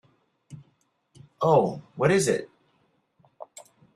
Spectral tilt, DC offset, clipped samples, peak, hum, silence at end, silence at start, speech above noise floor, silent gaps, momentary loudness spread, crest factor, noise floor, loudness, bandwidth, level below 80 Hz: -5.5 dB/octave; under 0.1%; under 0.1%; -8 dBFS; none; 0.5 s; 0.5 s; 46 dB; none; 24 LU; 22 dB; -69 dBFS; -24 LUFS; 13 kHz; -64 dBFS